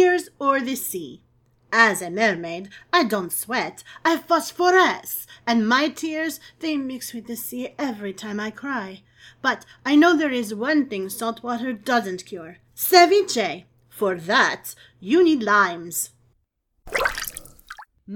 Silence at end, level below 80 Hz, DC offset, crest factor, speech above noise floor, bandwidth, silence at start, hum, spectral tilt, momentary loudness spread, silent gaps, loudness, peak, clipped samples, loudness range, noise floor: 0 s; -58 dBFS; under 0.1%; 22 dB; 48 dB; 19 kHz; 0 s; none; -3 dB/octave; 16 LU; none; -22 LUFS; 0 dBFS; under 0.1%; 5 LU; -70 dBFS